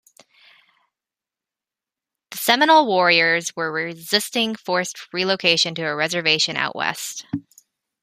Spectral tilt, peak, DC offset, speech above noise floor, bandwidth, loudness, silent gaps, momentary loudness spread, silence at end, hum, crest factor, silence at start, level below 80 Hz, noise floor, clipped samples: -2.5 dB/octave; -2 dBFS; under 0.1%; 69 dB; 15.5 kHz; -19 LUFS; none; 14 LU; 0.6 s; none; 20 dB; 2.3 s; -68 dBFS; -89 dBFS; under 0.1%